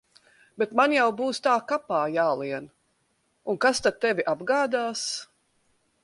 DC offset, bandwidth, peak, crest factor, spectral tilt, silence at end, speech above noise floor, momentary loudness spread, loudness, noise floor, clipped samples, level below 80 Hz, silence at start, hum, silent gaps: under 0.1%; 11.5 kHz; -8 dBFS; 20 dB; -3 dB/octave; 0.8 s; 46 dB; 11 LU; -25 LUFS; -71 dBFS; under 0.1%; -68 dBFS; 0.6 s; none; none